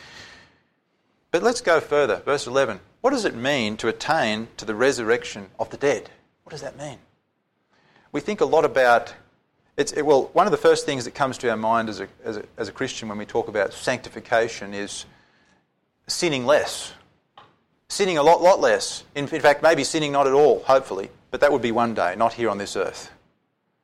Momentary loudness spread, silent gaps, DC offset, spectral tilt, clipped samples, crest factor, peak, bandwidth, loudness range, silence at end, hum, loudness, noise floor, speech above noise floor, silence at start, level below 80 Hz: 15 LU; none; under 0.1%; -3.5 dB/octave; under 0.1%; 18 dB; -6 dBFS; 15 kHz; 7 LU; 0.75 s; none; -22 LUFS; -71 dBFS; 50 dB; 0 s; -58 dBFS